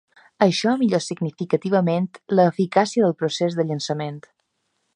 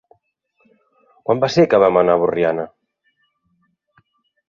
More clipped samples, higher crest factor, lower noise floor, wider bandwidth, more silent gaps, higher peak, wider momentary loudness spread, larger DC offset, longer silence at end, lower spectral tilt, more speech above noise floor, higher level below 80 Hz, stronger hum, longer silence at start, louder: neither; about the same, 20 dB vs 18 dB; first, -73 dBFS vs -66 dBFS; first, 10.5 kHz vs 7.2 kHz; neither; about the same, -2 dBFS vs -2 dBFS; second, 9 LU vs 14 LU; neither; second, 0.75 s vs 1.8 s; about the same, -6 dB/octave vs -6.5 dB/octave; about the same, 52 dB vs 52 dB; second, -70 dBFS vs -58 dBFS; neither; second, 0.4 s vs 1.3 s; second, -21 LUFS vs -16 LUFS